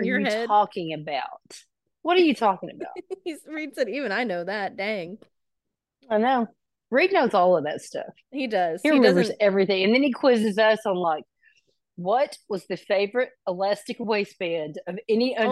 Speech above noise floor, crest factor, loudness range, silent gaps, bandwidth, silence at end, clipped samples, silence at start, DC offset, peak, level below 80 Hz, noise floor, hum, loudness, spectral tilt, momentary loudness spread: 60 dB; 20 dB; 6 LU; none; 12.5 kHz; 0 s; under 0.1%; 0 s; under 0.1%; -6 dBFS; -76 dBFS; -83 dBFS; none; -24 LUFS; -5.5 dB/octave; 14 LU